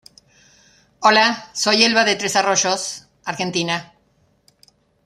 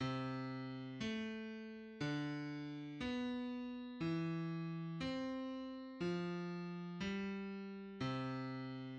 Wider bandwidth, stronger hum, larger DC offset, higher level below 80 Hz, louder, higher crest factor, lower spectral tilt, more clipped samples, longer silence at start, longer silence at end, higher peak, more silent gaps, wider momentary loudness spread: first, 14 kHz vs 8.6 kHz; neither; neither; first, -66 dBFS vs -72 dBFS; first, -17 LUFS vs -44 LUFS; first, 20 dB vs 14 dB; second, -2 dB/octave vs -7 dB/octave; neither; first, 1 s vs 0 s; first, 1.2 s vs 0 s; first, -2 dBFS vs -30 dBFS; neither; first, 12 LU vs 6 LU